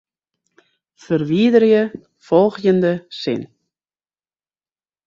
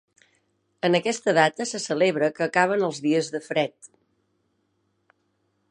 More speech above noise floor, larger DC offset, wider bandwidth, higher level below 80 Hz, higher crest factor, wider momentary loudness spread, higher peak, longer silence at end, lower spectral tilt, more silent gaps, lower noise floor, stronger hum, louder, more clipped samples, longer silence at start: first, over 74 dB vs 49 dB; neither; second, 7.4 kHz vs 11 kHz; first, -62 dBFS vs -78 dBFS; about the same, 18 dB vs 22 dB; first, 11 LU vs 7 LU; about the same, -2 dBFS vs -4 dBFS; second, 1.6 s vs 1.85 s; first, -7.5 dB/octave vs -4.5 dB/octave; neither; first, under -90 dBFS vs -72 dBFS; neither; first, -17 LUFS vs -23 LUFS; neither; first, 1.1 s vs 0.85 s